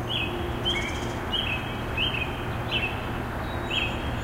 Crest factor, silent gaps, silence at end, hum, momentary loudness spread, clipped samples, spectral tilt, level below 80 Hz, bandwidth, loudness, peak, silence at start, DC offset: 16 dB; none; 0 s; none; 5 LU; under 0.1%; -4.5 dB/octave; -38 dBFS; 16 kHz; -28 LUFS; -14 dBFS; 0 s; under 0.1%